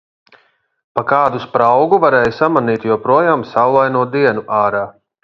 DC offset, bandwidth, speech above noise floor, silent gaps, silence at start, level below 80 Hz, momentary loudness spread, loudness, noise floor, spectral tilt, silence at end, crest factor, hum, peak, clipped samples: under 0.1%; 7 kHz; 40 dB; none; 0.95 s; -54 dBFS; 6 LU; -14 LUFS; -53 dBFS; -8 dB/octave; 0.35 s; 14 dB; none; 0 dBFS; under 0.1%